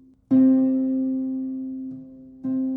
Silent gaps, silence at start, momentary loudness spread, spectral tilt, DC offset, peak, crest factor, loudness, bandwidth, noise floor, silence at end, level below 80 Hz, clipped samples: none; 0.3 s; 17 LU; -11.5 dB/octave; under 0.1%; -10 dBFS; 12 dB; -22 LUFS; 2 kHz; -42 dBFS; 0 s; -64 dBFS; under 0.1%